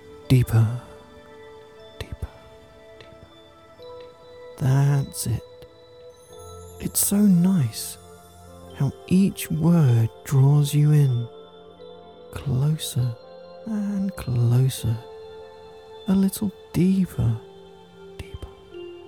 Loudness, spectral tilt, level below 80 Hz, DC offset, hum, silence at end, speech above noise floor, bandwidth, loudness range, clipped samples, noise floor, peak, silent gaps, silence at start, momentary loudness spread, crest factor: -22 LUFS; -6.5 dB/octave; -48 dBFS; 0.1%; none; 0.05 s; 29 dB; 19 kHz; 8 LU; under 0.1%; -49 dBFS; -6 dBFS; none; 0.05 s; 25 LU; 16 dB